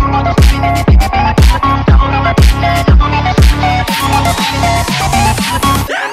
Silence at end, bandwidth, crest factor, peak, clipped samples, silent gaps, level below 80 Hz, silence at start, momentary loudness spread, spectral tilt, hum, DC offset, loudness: 0 s; 15.5 kHz; 10 dB; 0 dBFS; under 0.1%; none; -12 dBFS; 0 s; 3 LU; -5 dB/octave; none; under 0.1%; -10 LUFS